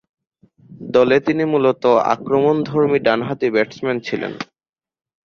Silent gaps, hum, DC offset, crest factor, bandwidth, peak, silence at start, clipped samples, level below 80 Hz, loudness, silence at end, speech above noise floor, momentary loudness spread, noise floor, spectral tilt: none; none; under 0.1%; 16 dB; 7 kHz; -2 dBFS; 0.7 s; under 0.1%; -58 dBFS; -17 LUFS; 0.8 s; over 73 dB; 10 LU; under -90 dBFS; -7 dB/octave